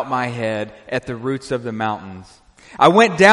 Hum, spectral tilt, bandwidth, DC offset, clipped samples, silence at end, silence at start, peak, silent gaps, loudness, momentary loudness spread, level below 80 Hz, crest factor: none; -5 dB/octave; 11.5 kHz; under 0.1%; under 0.1%; 0 s; 0 s; 0 dBFS; none; -18 LUFS; 16 LU; -54 dBFS; 18 dB